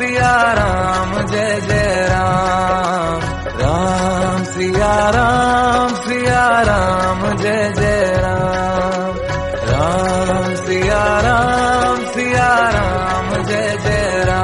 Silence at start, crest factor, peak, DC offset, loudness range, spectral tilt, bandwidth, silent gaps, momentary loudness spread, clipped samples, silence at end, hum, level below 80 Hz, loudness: 0 s; 14 dB; -2 dBFS; 0.2%; 2 LU; -5 dB/octave; 11.5 kHz; none; 5 LU; under 0.1%; 0 s; none; -28 dBFS; -15 LUFS